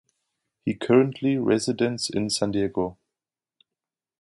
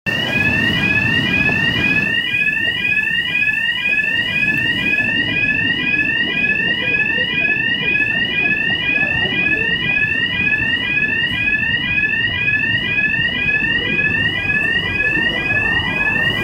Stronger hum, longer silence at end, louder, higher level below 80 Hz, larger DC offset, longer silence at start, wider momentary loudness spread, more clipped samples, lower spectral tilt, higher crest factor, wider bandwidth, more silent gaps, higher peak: neither; first, 1.3 s vs 0 s; second, -24 LUFS vs -15 LUFS; second, -58 dBFS vs -40 dBFS; neither; first, 0.65 s vs 0.05 s; first, 10 LU vs 1 LU; neither; about the same, -5 dB/octave vs -4.5 dB/octave; first, 20 dB vs 12 dB; second, 11.5 kHz vs 16 kHz; neither; about the same, -6 dBFS vs -4 dBFS